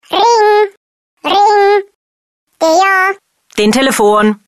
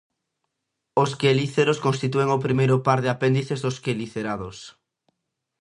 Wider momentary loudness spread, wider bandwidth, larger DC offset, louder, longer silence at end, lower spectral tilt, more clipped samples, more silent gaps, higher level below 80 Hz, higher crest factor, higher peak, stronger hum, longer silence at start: about the same, 9 LU vs 9 LU; first, 13 kHz vs 11 kHz; neither; first, -10 LUFS vs -23 LUFS; second, 0.15 s vs 0.9 s; second, -3.5 dB/octave vs -6 dB/octave; neither; first, 0.77-1.17 s, 1.95-2.47 s vs none; first, -52 dBFS vs -60 dBFS; second, 10 dB vs 20 dB; first, 0 dBFS vs -4 dBFS; neither; second, 0.1 s vs 0.95 s